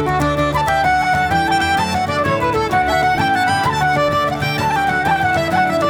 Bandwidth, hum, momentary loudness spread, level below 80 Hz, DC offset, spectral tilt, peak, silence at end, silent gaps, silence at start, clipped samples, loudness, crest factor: 19 kHz; none; 2 LU; -36 dBFS; under 0.1%; -5 dB/octave; -4 dBFS; 0 s; none; 0 s; under 0.1%; -16 LUFS; 12 dB